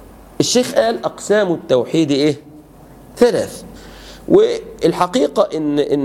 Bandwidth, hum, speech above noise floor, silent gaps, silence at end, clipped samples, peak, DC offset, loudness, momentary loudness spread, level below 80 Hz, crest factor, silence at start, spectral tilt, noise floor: 16 kHz; none; 26 dB; none; 0 s; under 0.1%; 0 dBFS; under 0.1%; -16 LUFS; 15 LU; -48 dBFS; 16 dB; 0 s; -4.5 dB/octave; -41 dBFS